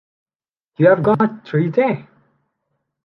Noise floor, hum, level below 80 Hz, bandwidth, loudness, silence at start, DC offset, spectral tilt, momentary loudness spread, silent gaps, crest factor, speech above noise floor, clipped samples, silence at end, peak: -83 dBFS; none; -60 dBFS; 5.6 kHz; -17 LUFS; 0.8 s; under 0.1%; -10 dB/octave; 7 LU; none; 18 dB; 67 dB; under 0.1%; 1.05 s; -2 dBFS